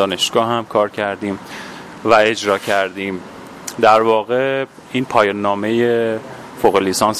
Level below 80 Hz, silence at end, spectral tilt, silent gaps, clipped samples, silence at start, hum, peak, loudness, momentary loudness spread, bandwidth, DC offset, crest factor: -54 dBFS; 0 s; -4 dB/octave; none; under 0.1%; 0 s; none; 0 dBFS; -16 LUFS; 17 LU; 15.5 kHz; under 0.1%; 16 dB